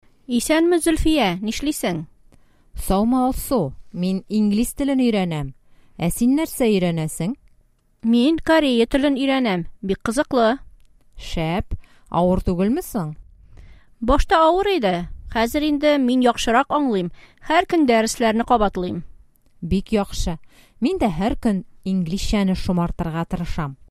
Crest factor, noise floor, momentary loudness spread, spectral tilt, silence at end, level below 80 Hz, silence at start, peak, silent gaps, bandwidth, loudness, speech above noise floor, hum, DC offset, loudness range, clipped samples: 16 dB; -58 dBFS; 11 LU; -5.5 dB/octave; 0.05 s; -34 dBFS; 0.3 s; -4 dBFS; none; 15.5 kHz; -20 LUFS; 39 dB; none; under 0.1%; 4 LU; under 0.1%